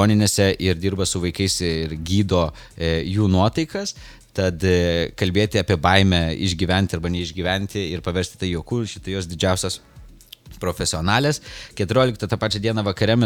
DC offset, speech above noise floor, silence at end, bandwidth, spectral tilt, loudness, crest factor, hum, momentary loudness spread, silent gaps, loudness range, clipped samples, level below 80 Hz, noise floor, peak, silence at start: under 0.1%; 23 dB; 0 s; 17 kHz; -5 dB/octave; -21 LUFS; 20 dB; none; 9 LU; none; 5 LU; under 0.1%; -40 dBFS; -44 dBFS; 0 dBFS; 0 s